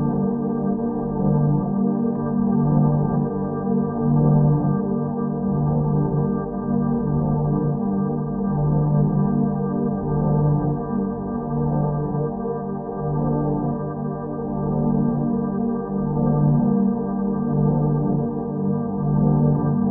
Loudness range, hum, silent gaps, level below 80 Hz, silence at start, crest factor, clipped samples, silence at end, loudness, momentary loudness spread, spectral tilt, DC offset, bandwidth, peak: 4 LU; none; none; -40 dBFS; 0 s; 14 dB; under 0.1%; 0 s; -22 LUFS; 7 LU; -10 dB/octave; under 0.1%; 1.9 kHz; -6 dBFS